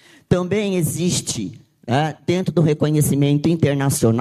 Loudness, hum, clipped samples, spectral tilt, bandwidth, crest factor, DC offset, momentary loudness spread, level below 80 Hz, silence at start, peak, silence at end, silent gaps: -19 LUFS; none; under 0.1%; -5.5 dB/octave; 14.5 kHz; 16 dB; under 0.1%; 6 LU; -46 dBFS; 0.3 s; -2 dBFS; 0 s; none